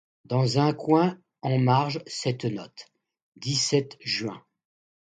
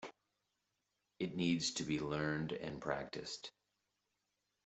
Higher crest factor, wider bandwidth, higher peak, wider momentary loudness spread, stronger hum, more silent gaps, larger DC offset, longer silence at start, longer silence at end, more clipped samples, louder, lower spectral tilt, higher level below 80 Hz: about the same, 18 dB vs 22 dB; first, 9.4 kHz vs 8.2 kHz; first, -8 dBFS vs -22 dBFS; about the same, 14 LU vs 12 LU; second, none vs 50 Hz at -60 dBFS; first, 3.22-3.32 s vs none; neither; first, 0.3 s vs 0 s; second, 0.65 s vs 1.15 s; neither; first, -26 LUFS vs -40 LUFS; about the same, -5.5 dB/octave vs -4.5 dB/octave; about the same, -66 dBFS vs -70 dBFS